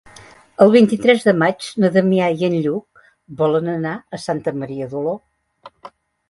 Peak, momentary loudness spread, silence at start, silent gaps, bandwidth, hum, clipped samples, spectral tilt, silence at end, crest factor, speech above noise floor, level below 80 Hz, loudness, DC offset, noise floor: 0 dBFS; 13 LU; 0.6 s; none; 11.5 kHz; none; under 0.1%; -6.5 dB/octave; 0.4 s; 18 dB; 28 dB; -60 dBFS; -17 LUFS; under 0.1%; -44 dBFS